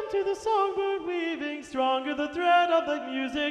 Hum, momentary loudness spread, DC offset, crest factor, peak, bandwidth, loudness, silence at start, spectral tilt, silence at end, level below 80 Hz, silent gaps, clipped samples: none; 8 LU; under 0.1%; 14 dB; -12 dBFS; 11 kHz; -27 LUFS; 0 s; -3.5 dB/octave; 0 s; -62 dBFS; none; under 0.1%